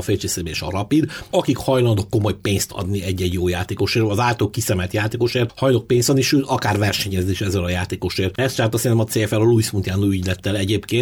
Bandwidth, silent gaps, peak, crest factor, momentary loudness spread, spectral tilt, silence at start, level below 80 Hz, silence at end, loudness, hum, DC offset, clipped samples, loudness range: 18 kHz; none; -4 dBFS; 14 dB; 5 LU; -5 dB/octave; 0 s; -44 dBFS; 0 s; -20 LUFS; none; under 0.1%; under 0.1%; 2 LU